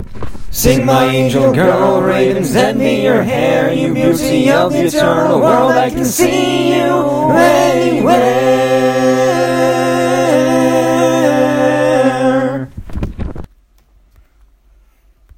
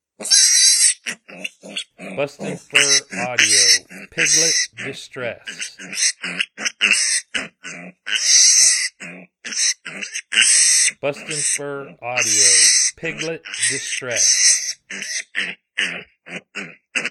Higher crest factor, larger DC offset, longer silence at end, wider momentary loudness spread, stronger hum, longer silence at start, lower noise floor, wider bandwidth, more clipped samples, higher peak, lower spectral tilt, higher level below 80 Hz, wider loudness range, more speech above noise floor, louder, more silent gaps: second, 12 dB vs 20 dB; neither; first, 1.95 s vs 0 s; second, 5 LU vs 20 LU; neither; second, 0 s vs 0.2 s; first, -49 dBFS vs -38 dBFS; second, 16.5 kHz vs 19 kHz; neither; about the same, 0 dBFS vs 0 dBFS; first, -5.5 dB/octave vs 1 dB/octave; first, -34 dBFS vs -68 dBFS; about the same, 4 LU vs 5 LU; first, 38 dB vs 19 dB; first, -12 LUFS vs -15 LUFS; neither